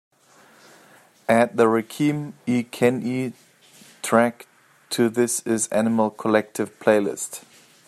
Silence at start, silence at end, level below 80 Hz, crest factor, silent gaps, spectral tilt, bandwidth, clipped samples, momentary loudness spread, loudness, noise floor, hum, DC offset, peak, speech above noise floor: 1.3 s; 0.5 s; -68 dBFS; 20 dB; none; -5 dB/octave; 14.5 kHz; under 0.1%; 11 LU; -22 LUFS; -54 dBFS; none; under 0.1%; -2 dBFS; 33 dB